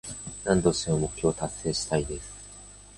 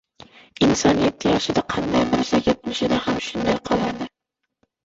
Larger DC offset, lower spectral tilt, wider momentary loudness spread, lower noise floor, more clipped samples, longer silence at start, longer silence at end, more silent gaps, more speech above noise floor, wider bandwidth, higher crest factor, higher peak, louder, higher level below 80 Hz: neither; about the same, -4.5 dB/octave vs -4.5 dB/octave; first, 18 LU vs 6 LU; second, -48 dBFS vs -80 dBFS; neither; second, 0.05 s vs 0.6 s; second, 0 s vs 0.75 s; neither; second, 21 dB vs 59 dB; first, 11.5 kHz vs 8 kHz; about the same, 20 dB vs 18 dB; second, -8 dBFS vs -4 dBFS; second, -28 LUFS vs -21 LUFS; about the same, -46 dBFS vs -46 dBFS